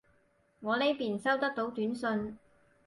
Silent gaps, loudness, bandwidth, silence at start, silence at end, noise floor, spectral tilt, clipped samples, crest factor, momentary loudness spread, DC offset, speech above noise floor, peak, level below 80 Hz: none; -32 LUFS; 11.5 kHz; 0.6 s; 0.5 s; -70 dBFS; -5.5 dB/octave; under 0.1%; 18 dB; 7 LU; under 0.1%; 38 dB; -16 dBFS; -70 dBFS